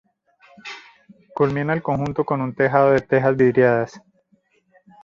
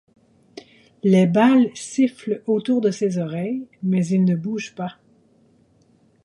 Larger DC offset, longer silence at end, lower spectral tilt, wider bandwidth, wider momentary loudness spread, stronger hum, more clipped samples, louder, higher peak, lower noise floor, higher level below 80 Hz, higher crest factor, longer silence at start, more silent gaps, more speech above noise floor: neither; second, 1.05 s vs 1.35 s; first, -8.5 dB/octave vs -7 dB/octave; second, 7.2 kHz vs 11.5 kHz; first, 20 LU vs 13 LU; neither; neither; about the same, -19 LUFS vs -20 LUFS; about the same, -2 dBFS vs -4 dBFS; first, -63 dBFS vs -58 dBFS; first, -54 dBFS vs -66 dBFS; about the same, 20 dB vs 16 dB; about the same, 0.65 s vs 0.55 s; neither; first, 44 dB vs 39 dB